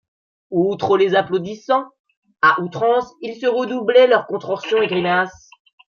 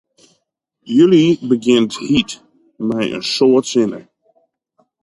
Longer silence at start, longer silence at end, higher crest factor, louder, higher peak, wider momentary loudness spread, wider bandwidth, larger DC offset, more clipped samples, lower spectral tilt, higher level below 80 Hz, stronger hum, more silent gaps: second, 0.5 s vs 0.85 s; second, 0.65 s vs 1 s; about the same, 16 dB vs 14 dB; second, -18 LUFS vs -15 LUFS; about the same, -2 dBFS vs -2 dBFS; second, 10 LU vs 13 LU; second, 7 kHz vs 11.5 kHz; neither; neither; about the same, -6 dB/octave vs -5.5 dB/octave; second, -64 dBFS vs -54 dBFS; neither; first, 2.00-2.04 s, 2.17-2.22 s vs none